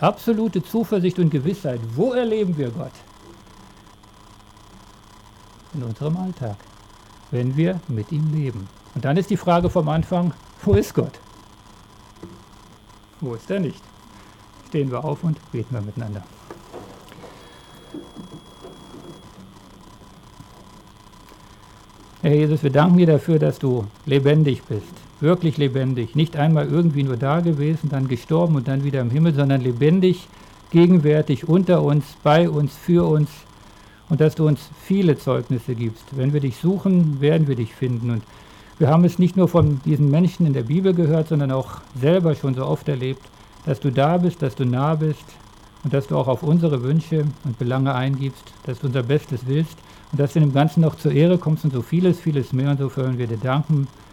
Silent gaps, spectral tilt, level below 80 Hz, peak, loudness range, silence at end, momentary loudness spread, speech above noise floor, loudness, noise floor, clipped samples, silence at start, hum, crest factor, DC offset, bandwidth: none; -8.5 dB/octave; -48 dBFS; -6 dBFS; 13 LU; 0.25 s; 13 LU; 28 dB; -20 LUFS; -47 dBFS; under 0.1%; 0 s; none; 14 dB; under 0.1%; 15 kHz